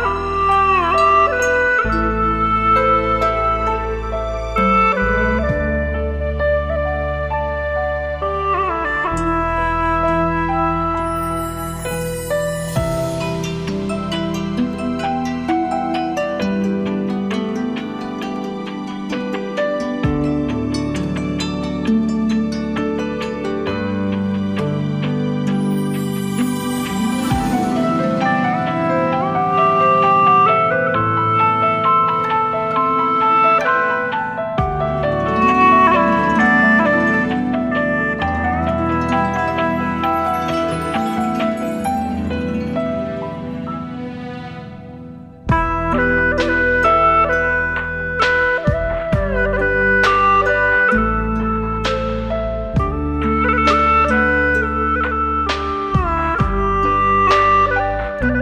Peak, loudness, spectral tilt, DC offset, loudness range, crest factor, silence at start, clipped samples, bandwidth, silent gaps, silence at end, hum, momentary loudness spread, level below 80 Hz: -2 dBFS; -17 LUFS; -6 dB/octave; under 0.1%; 7 LU; 16 dB; 0 s; under 0.1%; 15.5 kHz; none; 0 s; none; 9 LU; -30 dBFS